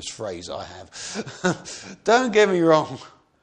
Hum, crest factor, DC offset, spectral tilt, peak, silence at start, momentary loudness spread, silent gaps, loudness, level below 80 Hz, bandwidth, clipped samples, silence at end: none; 20 dB; under 0.1%; -4.5 dB/octave; -2 dBFS; 0 s; 18 LU; none; -21 LUFS; -60 dBFS; 10 kHz; under 0.1%; 0.35 s